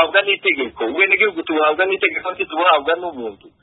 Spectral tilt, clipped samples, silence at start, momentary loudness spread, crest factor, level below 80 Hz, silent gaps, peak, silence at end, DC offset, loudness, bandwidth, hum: -7.5 dB/octave; under 0.1%; 0 s; 9 LU; 18 dB; -60 dBFS; none; 0 dBFS; 0.3 s; under 0.1%; -17 LUFS; 4.1 kHz; none